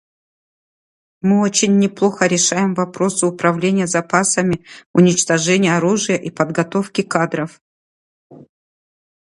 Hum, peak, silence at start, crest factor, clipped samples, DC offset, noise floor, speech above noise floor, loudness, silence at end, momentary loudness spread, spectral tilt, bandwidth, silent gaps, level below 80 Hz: none; 0 dBFS; 1.25 s; 18 dB; under 0.1%; under 0.1%; under -90 dBFS; over 74 dB; -16 LUFS; 0.9 s; 6 LU; -4.5 dB/octave; 11.5 kHz; 4.86-4.94 s, 7.61-8.30 s; -58 dBFS